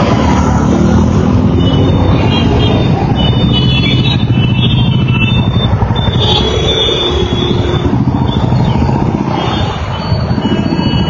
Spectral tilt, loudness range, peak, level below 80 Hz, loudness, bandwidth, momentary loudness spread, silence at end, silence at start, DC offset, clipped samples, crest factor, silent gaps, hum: -6.5 dB/octave; 3 LU; 0 dBFS; -20 dBFS; -11 LUFS; 7.2 kHz; 4 LU; 0 s; 0 s; under 0.1%; under 0.1%; 10 dB; none; none